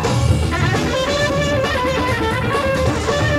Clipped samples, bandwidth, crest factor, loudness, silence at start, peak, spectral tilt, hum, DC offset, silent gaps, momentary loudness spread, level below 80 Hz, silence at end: under 0.1%; 15.5 kHz; 14 dB; -18 LUFS; 0 s; -4 dBFS; -5 dB/octave; none; under 0.1%; none; 1 LU; -28 dBFS; 0 s